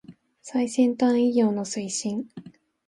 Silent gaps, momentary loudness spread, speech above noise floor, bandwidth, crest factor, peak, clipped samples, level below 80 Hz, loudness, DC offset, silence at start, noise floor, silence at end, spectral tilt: none; 10 LU; 22 dB; 11.5 kHz; 16 dB; -10 dBFS; under 0.1%; -70 dBFS; -24 LUFS; under 0.1%; 0.1 s; -45 dBFS; 0.4 s; -5 dB/octave